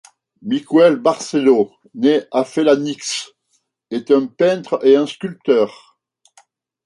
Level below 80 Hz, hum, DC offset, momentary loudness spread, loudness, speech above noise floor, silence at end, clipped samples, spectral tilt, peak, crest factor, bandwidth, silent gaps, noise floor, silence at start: -68 dBFS; none; under 0.1%; 11 LU; -17 LUFS; 51 dB; 1.15 s; under 0.1%; -5 dB/octave; -2 dBFS; 16 dB; 11.5 kHz; none; -67 dBFS; 0.45 s